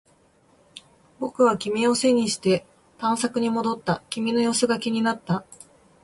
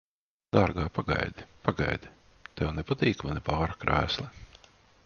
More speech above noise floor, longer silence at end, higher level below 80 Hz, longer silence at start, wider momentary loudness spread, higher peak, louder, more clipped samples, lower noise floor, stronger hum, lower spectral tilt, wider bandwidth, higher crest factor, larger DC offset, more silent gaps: first, 37 dB vs 29 dB; about the same, 0.5 s vs 0.5 s; second, -62 dBFS vs -44 dBFS; first, 0.75 s vs 0.55 s; about the same, 8 LU vs 8 LU; about the same, -8 dBFS vs -6 dBFS; first, -23 LUFS vs -30 LUFS; neither; about the same, -59 dBFS vs -58 dBFS; neither; second, -4.5 dB/octave vs -6.5 dB/octave; first, 11.5 kHz vs 7 kHz; second, 16 dB vs 24 dB; neither; neither